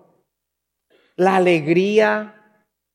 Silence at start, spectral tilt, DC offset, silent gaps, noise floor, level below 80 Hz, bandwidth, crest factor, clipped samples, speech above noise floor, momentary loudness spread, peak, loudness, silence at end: 1.2 s; -6.5 dB/octave; under 0.1%; none; -80 dBFS; -78 dBFS; 11.5 kHz; 18 dB; under 0.1%; 63 dB; 17 LU; -2 dBFS; -17 LUFS; 0.65 s